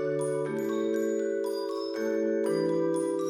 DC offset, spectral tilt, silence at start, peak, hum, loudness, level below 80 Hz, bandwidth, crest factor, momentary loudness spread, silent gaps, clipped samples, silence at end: under 0.1%; -6 dB/octave; 0 s; -18 dBFS; none; -29 LUFS; -74 dBFS; 15.5 kHz; 12 dB; 4 LU; none; under 0.1%; 0 s